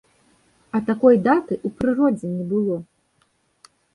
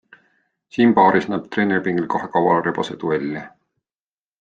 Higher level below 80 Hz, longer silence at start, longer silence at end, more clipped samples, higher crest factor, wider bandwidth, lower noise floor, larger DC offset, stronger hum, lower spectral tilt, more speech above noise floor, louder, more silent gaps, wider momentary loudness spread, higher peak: first, -56 dBFS vs -62 dBFS; about the same, 0.75 s vs 0.75 s; first, 1.1 s vs 0.95 s; neither; about the same, 18 dB vs 18 dB; first, 11 kHz vs 7.6 kHz; second, -65 dBFS vs under -90 dBFS; neither; neither; first, -9 dB/octave vs -7 dB/octave; second, 46 dB vs over 72 dB; about the same, -20 LUFS vs -19 LUFS; neither; about the same, 11 LU vs 11 LU; about the same, -4 dBFS vs -2 dBFS